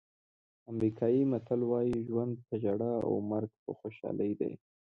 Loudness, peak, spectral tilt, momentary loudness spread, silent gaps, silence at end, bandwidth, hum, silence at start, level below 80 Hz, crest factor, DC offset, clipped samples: -33 LUFS; -18 dBFS; -10.5 dB/octave; 12 LU; 3.59-3.66 s; 0.4 s; 5.6 kHz; none; 0.7 s; -66 dBFS; 16 dB; under 0.1%; under 0.1%